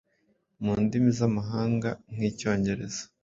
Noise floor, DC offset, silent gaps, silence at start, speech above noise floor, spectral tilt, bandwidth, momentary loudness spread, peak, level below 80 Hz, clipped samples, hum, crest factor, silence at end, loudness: -71 dBFS; under 0.1%; none; 0.6 s; 44 dB; -6.5 dB/octave; 7.8 kHz; 9 LU; -10 dBFS; -54 dBFS; under 0.1%; none; 18 dB; 0.2 s; -28 LUFS